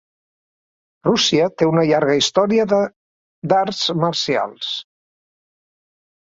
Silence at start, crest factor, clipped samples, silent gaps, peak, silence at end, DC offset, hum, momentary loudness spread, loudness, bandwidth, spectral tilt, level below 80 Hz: 1.05 s; 18 dB; under 0.1%; 2.96-3.42 s; -2 dBFS; 1.45 s; under 0.1%; none; 10 LU; -18 LUFS; 8 kHz; -4.5 dB/octave; -60 dBFS